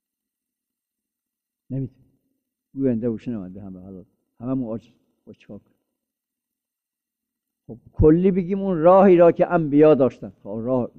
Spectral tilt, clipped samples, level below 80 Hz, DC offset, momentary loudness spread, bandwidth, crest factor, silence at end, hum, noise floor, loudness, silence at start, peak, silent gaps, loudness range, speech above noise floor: -10.5 dB/octave; under 0.1%; -42 dBFS; under 0.1%; 24 LU; 4.3 kHz; 18 dB; 0.1 s; none; -87 dBFS; -18 LUFS; 1.7 s; -4 dBFS; none; 18 LU; 67 dB